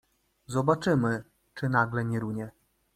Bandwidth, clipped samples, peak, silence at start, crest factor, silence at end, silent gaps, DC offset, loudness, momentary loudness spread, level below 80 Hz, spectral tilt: 14 kHz; under 0.1%; -8 dBFS; 0.5 s; 22 dB; 0.45 s; none; under 0.1%; -28 LUFS; 12 LU; -62 dBFS; -7 dB/octave